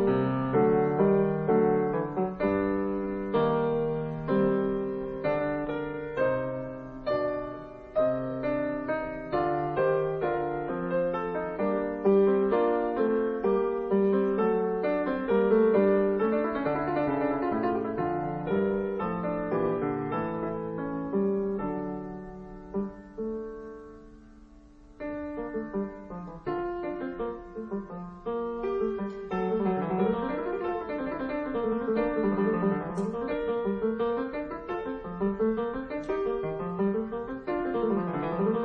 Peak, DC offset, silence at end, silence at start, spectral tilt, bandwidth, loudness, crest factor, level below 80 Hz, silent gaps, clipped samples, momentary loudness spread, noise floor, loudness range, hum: -12 dBFS; under 0.1%; 0 s; 0 s; -9.5 dB/octave; 5.2 kHz; -29 LUFS; 18 dB; -52 dBFS; none; under 0.1%; 11 LU; -52 dBFS; 10 LU; none